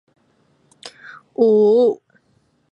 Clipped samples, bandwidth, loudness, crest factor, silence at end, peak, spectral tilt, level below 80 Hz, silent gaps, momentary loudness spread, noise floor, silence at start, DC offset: under 0.1%; 9.2 kHz; -15 LUFS; 16 dB; 0.75 s; -4 dBFS; -7 dB/octave; -76 dBFS; none; 26 LU; -62 dBFS; 0.85 s; under 0.1%